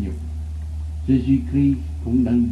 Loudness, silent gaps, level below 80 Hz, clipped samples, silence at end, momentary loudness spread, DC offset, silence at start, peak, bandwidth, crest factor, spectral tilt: -22 LUFS; none; -30 dBFS; under 0.1%; 0 s; 12 LU; under 0.1%; 0 s; -6 dBFS; 7.8 kHz; 14 dB; -9.5 dB/octave